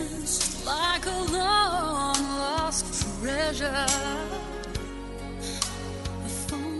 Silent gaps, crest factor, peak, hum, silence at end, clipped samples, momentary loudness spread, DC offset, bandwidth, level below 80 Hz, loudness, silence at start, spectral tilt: none; 22 dB; -6 dBFS; none; 0 s; under 0.1%; 11 LU; under 0.1%; 11.5 kHz; -40 dBFS; -27 LUFS; 0 s; -2.5 dB/octave